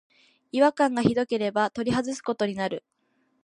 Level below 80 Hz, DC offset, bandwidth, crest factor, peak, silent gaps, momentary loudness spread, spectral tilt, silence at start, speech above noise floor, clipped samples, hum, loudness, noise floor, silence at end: -60 dBFS; under 0.1%; 10.5 kHz; 22 dB; -6 dBFS; none; 9 LU; -5.5 dB/octave; 0.55 s; 46 dB; under 0.1%; none; -25 LUFS; -70 dBFS; 0.65 s